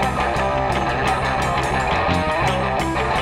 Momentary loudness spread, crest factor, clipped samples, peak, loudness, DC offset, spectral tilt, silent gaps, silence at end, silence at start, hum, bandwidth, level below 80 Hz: 2 LU; 14 dB; under 0.1%; -6 dBFS; -20 LUFS; under 0.1%; -5 dB/octave; none; 0 s; 0 s; none; 16 kHz; -32 dBFS